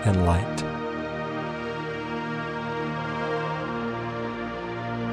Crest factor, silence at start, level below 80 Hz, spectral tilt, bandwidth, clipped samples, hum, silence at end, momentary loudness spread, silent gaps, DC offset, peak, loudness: 18 dB; 0 s; -44 dBFS; -6.5 dB/octave; 11 kHz; under 0.1%; none; 0 s; 7 LU; none; under 0.1%; -10 dBFS; -29 LUFS